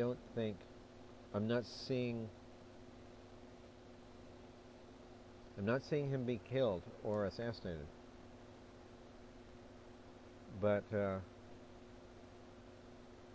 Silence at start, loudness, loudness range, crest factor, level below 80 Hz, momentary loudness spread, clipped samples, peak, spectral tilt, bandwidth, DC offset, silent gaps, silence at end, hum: 0 s; -41 LUFS; 10 LU; 20 dB; -64 dBFS; 21 LU; under 0.1%; -24 dBFS; -7.5 dB/octave; 8 kHz; under 0.1%; none; 0 s; none